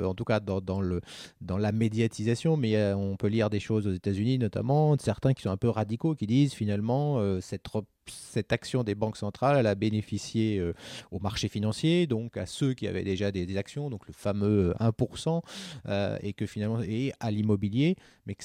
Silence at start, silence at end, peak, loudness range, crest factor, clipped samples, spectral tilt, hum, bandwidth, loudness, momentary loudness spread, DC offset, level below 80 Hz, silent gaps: 0 s; 0 s; -12 dBFS; 3 LU; 18 dB; under 0.1%; -7 dB/octave; none; 12.5 kHz; -29 LUFS; 10 LU; under 0.1%; -56 dBFS; none